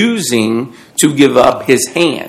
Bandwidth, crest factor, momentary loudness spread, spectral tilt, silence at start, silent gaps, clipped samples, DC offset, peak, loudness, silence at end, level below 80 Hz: 15.5 kHz; 12 dB; 8 LU; -4 dB/octave; 0 s; none; 1%; under 0.1%; 0 dBFS; -11 LUFS; 0 s; -46 dBFS